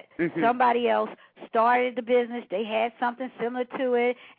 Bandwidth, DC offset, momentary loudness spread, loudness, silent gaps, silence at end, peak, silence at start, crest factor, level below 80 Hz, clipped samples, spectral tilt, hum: 4.6 kHz; under 0.1%; 9 LU; -26 LUFS; none; 0.1 s; -10 dBFS; 0.2 s; 16 dB; -76 dBFS; under 0.1%; -9 dB/octave; none